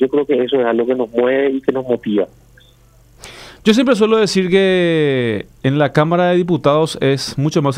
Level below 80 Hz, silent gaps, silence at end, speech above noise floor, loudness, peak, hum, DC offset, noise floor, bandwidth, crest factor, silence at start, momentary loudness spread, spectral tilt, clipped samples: -50 dBFS; none; 0 s; 33 dB; -15 LUFS; 0 dBFS; none; under 0.1%; -48 dBFS; 14.5 kHz; 14 dB; 0 s; 7 LU; -6 dB/octave; under 0.1%